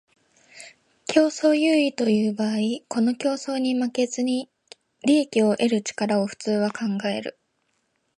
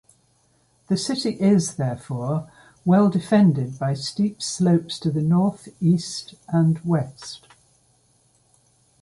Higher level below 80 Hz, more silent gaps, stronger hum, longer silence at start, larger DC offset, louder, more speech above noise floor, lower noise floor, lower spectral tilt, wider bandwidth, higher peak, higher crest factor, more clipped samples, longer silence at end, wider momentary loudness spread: second, -72 dBFS vs -60 dBFS; neither; neither; second, 0.55 s vs 0.9 s; neither; about the same, -23 LUFS vs -22 LUFS; first, 49 dB vs 42 dB; first, -72 dBFS vs -63 dBFS; second, -5 dB/octave vs -6.5 dB/octave; about the same, 11.5 kHz vs 11.5 kHz; about the same, -4 dBFS vs -6 dBFS; about the same, 20 dB vs 16 dB; neither; second, 0.85 s vs 1.65 s; about the same, 10 LU vs 11 LU